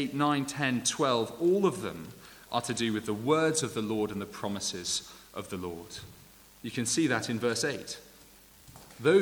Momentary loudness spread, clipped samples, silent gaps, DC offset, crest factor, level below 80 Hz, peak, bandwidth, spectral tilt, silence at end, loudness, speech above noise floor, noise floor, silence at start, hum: 17 LU; under 0.1%; none; under 0.1%; 18 dB; -64 dBFS; -12 dBFS; over 20 kHz; -4 dB/octave; 0 s; -30 LUFS; 25 dB; -56 dBFS; 0 s; none